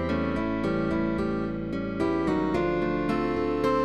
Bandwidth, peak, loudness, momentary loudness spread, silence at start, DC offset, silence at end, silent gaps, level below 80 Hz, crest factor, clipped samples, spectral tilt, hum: 11 kHz; -14 dBFS; -27 LUFS; 4 LU; 0 s; 0.5%; 0 s; none; -44 dBFS; 14 dB; under 0.1%; -8 dB/octave; none